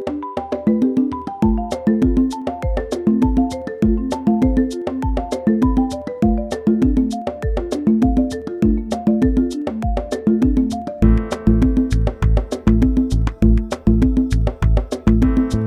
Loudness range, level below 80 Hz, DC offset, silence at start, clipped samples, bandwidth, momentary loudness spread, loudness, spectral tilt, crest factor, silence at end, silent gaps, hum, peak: 2 LU; -22 dBFS; under 0.1%; 0 s; under 0.1%; 11 kHz; 7 LU; -18 LUFS; -8 dB/octave; 16 dB; 0 s; none; none; 0 dBFS